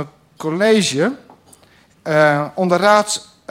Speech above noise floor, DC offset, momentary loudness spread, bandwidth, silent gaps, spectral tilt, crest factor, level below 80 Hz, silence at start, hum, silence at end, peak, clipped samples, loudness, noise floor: 36 dB; under 0.1%; 16 LU; 16 kHz; none; -4 dB/octave; 16 dB; -62 dBFS; 0 s; none; 0.3 s; 0 dBFS; under 0.1%; -16 LUFS; -51 dBFS